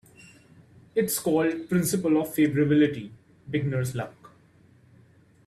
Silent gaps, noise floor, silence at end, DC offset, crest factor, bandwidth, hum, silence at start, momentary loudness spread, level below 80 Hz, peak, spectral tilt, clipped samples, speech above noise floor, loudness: none; -57 dBFS; 1.2 s; under 0.1%; 16 dB; 14 kHz; none; 0.95 s; 13 LU; -62 dBFS; -12 dBFS; -6 dB/octave; under 0.1%; 33 dB; -25 LUFS